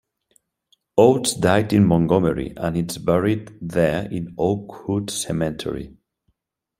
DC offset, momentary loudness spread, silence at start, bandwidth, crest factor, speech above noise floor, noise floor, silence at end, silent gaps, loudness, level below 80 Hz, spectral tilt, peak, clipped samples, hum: under 0.1%; 11 LU; 0.95 s; 16 kHz; 20 dB; 53 dB; -73 dBFS; 0.9 s; none; -21 LUFS; -48 dBFS; -6 dB/octave; -2 dBFS; under 0.1%; none